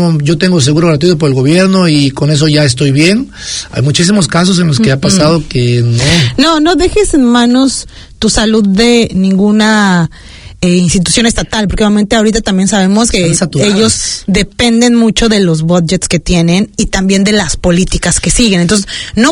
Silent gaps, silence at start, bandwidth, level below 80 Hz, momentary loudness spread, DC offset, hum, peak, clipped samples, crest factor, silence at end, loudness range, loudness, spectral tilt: none; 0 s; 11 kHz; -26 dBFS; 5 LU; under 0.1%; none; 0 dBFS; 0.5%; 8 dB; 0 s; 1 LU; -9 LUFS; -4.5 dB/octave